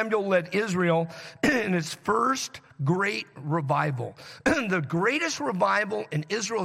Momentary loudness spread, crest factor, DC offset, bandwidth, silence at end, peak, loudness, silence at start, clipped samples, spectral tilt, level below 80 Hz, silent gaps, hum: 7 LU; 16 dB; under 0.1%; 15.5 kHz; 0 s; -12 dBFS; -26 LUFS; 0 s; under 0.1%; -5 dB/octave; -60 dBFS; none; none